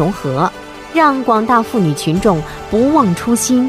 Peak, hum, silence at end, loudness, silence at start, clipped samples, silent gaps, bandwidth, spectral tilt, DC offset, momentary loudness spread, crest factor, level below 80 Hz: 0 dBFS; none; 0 s; -14 LUFS; 0 s; under 0.1%; none; 16 kHz; -5.5 dB/octave; under 0.1%; 7 LU; 14 dB; -38 dBFS